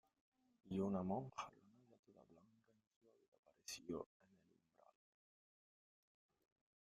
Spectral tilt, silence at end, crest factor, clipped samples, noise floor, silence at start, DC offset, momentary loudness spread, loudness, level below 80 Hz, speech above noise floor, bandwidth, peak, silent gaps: -6 dB/octave; 2.85 s; 22 dB; under 0.1%; -78 dBFS; 0.65 s; under 0.1%; 14 LU; -48 LUFS; -82 dBFS; 32 dB; 13 kHz; -32 dBFS; 1.99-2.03 s, 2.87-3.01 s, 3.28-3.32 s, 3.39-3.43 s